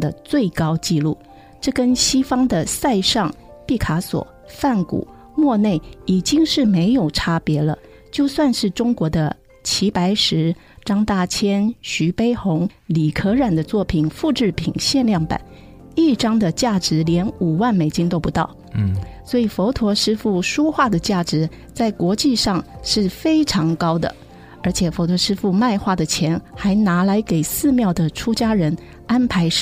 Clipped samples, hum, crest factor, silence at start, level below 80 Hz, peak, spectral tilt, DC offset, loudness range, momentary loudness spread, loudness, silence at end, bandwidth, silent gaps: under 0.1%; none; 14 dB; 0 s; -40 dBFS; -4 dBFS; -5 dB/octave; under 0.1%; 1 LU; 7 LU; -19 LUFS; 0 s; 16 kHz; none